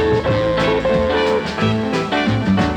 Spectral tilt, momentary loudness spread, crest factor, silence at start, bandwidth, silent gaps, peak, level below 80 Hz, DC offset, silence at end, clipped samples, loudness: -6.5 dB/octave; 2 LU; 12 dB; 0 s; 9.8 kHz; none; -4 dBFS; -34 dBFS; under 0.1%; 0 s; under 0.1%; -17 LUFS